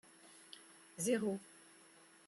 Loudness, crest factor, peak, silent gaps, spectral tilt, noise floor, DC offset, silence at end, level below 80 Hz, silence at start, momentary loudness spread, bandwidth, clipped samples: -39 LUFS; 22 dB; -22 dBFS; none; -4 dB/octave; -64 dBFS; under 0.1%; 0.8 s; -88 dBFS; 0.25 s; 24 LU; 13 kHz; under 0.1%